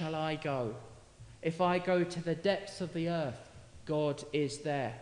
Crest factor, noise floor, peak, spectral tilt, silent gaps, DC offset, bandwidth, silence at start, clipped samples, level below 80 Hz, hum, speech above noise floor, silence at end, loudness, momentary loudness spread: 18 dB; -54 dBFS; -18 dBFS; -6 dB/octave; none; under 0.1%; 11 kHz; 0 s; under 0.1%; -64 dBFS; none; 21 dB; 0 s; -34 LUFS; 10 LU